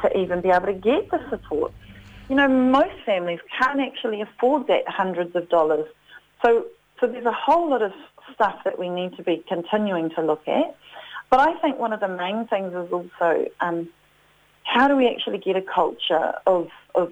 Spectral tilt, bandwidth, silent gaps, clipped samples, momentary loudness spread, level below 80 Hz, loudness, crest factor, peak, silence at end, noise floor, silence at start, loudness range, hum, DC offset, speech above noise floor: -6.5 dB/octave; 9.2 kHz; none; under 0.1%; 10 LU; -56 dBFS; -22 LUFS; 20 dB; -4 dBFS; 0 s; -58 dBFS; 0 s; 3 LU; none; under 0.1%; 36 dB